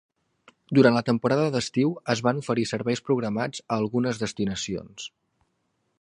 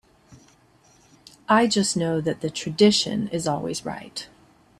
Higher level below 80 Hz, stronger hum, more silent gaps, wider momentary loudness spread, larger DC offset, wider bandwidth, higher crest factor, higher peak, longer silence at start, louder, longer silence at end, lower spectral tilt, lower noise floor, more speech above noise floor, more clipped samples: about the same, -60 dBFS vs -60 dBFS; neither; neither; second, 12 LU vs 17 LU; neither; second, 11 kHz vs 13 kHz; about the same, 22 dB vs 20 dB; about the same, -4 dBFS vs -4 dBFS; first, 0.7 s vs 0.3 s; about the same, -25 LUFS vs -23 LUFS; first, 0.95 s vs 0.55 s; first, -5.5 dB/octave vs -4 dB/octave; first, -74 dBFS vs -57 dBFS; first, 49 dB vs 35 dB; neither